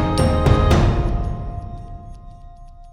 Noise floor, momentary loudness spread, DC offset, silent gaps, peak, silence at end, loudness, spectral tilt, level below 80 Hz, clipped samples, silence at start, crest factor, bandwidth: -39 dBFS; 22 LU; under 0.1%; none; -2 dBFS; 0 s; -18 LUFS; -7 dB/octave; -24 dBFS; under 0.1%; 0 s; 18 dB; 13 kHz